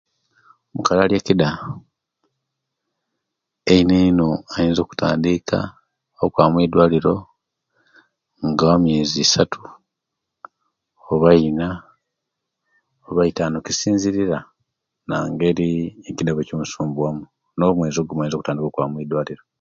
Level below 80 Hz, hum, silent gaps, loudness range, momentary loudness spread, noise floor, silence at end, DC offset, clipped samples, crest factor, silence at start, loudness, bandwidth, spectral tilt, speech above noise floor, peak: -46 dBFS; none; none; 4 LU; 12 LU; -81 dBFS; 0.25 s; under 0.1%; under 0.1%; 20 dB; 0.75 s; -19 LUFS; 7.6 kHz; -5.5 dB/octave; 63 dB; 0 dBFS